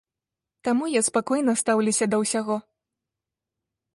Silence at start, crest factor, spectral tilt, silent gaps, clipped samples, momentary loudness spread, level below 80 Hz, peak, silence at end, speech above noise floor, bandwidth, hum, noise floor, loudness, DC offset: 0.65 s; 16 dB; -3.5 dB/octave; none; under 0.1%; 7 LU; -70 dBFS; -10 dBFS; 1.35 s; 65 dB; 11.5 kHz; none; -88 dBFS; -23 LUFS; under 0.1%